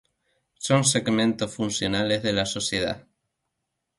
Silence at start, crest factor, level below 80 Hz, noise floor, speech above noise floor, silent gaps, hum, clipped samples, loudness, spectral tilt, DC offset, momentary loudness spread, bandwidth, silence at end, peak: 0.6 s; 20 dB; -54 dBFS; -81 dBFS; 56 dB; none; none; under 0.1%; -24 LUFS; -3.5 dB/octave; under 0.1%; 8 LU; 11.5 kHz; 1 s; -6 dBFS